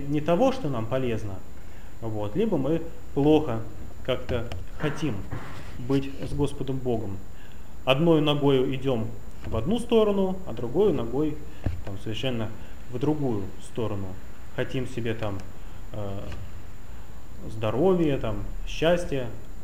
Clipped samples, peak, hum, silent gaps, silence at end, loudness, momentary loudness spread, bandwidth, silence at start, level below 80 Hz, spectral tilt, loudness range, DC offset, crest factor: under 0.1%; -4 dBFS; none; none; 0 s; -27 LUFS; 19 LU; 16 kHz; 0 s; -42 dBFS; -7 dB/octave; 8 LU; 3%; 22 dB